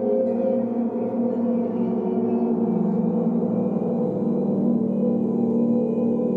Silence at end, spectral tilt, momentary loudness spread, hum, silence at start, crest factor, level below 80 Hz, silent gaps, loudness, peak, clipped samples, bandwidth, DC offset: 0 s; -12 dB/octave; 2 LU; none; 0 s; 10 dB; -68 dBFS; none; -23 LUFS; -12 dBFS; under 0.1%; 2.9 kHz; under 0.1%